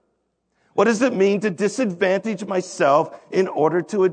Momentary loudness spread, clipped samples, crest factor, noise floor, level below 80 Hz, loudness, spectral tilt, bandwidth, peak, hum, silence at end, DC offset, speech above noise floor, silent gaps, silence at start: 6 LU; under 0.1%; 16 dB; -71 dBFS; -72 dBFS; -20 LUFS; -5.5 dB/octave; 9.4 kHz; -4 dBFS; none; 0 s; under 0.1%; 51 dB; none; 0.75 s